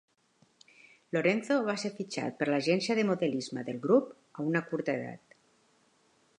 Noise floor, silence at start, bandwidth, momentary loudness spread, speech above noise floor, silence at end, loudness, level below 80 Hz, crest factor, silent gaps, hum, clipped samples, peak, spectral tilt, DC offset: -69 dBFS; 1.15 s; 11 kHz; 9 LU; 38 dB; 1.2 s; -31 LUFS; -80 dBFS; 20 dB; none; none; under 0.1%; -12 dBFS; -5.5 dB/octave; under 0.1%